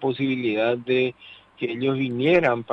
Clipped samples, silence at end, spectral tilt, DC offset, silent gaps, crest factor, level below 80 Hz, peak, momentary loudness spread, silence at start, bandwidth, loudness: under 0.1%; 0 s; -8 dB/octave; under 0.1%; none; 18 dB; -64 dBFS; -6 dBFS; 8 LU; 0 s; 6.2 kHz; -23 LUFS